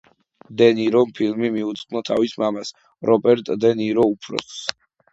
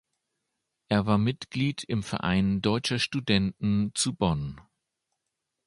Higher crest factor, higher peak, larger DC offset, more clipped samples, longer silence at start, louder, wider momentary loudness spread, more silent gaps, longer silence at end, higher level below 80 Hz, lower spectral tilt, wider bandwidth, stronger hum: about the same, 20 dB vs 20 dB; first, 0 dBFS vs -8 dBFS; neither; neither; second, 0.5 s vs 0.9 s; first, -20 LUFS vs -27 LUFS; first, 12 LU vs 5 LU; neither; second, 0.4 s vs 1.05 s; second, -64 dBFS vs -50 dBFS; about the same, -5.5 dB/octave vs -5 dB/octave; second, 8 kHz vs 11.5 kHz; neither